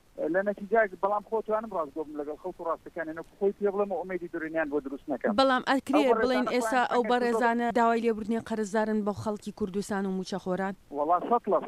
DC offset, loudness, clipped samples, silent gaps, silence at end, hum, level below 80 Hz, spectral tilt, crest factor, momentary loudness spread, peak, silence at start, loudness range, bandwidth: under 0.1%; -29 LUFS; under 0.1%; none; 0 s; none; -62 dBFS; -5.5 dB/octave; 18 dB; 10 LU; -10 dBFS; 0.15 s; 7 LU; 14.5 kHz